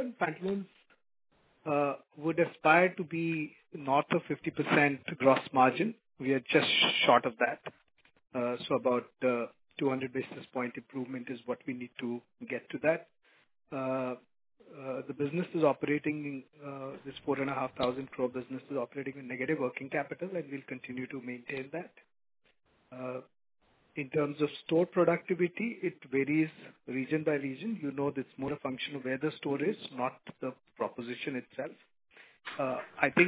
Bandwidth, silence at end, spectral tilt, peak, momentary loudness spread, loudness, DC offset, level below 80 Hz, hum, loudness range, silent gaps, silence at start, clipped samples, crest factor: 4 kHz; 0 s; -3.5 dB/octave; -10 dBFS; 15 LU; -33 LUFS; under 0.1%; -76 dBFS; none; 9 LU; none; 0 s; under 0.1%; 24 dB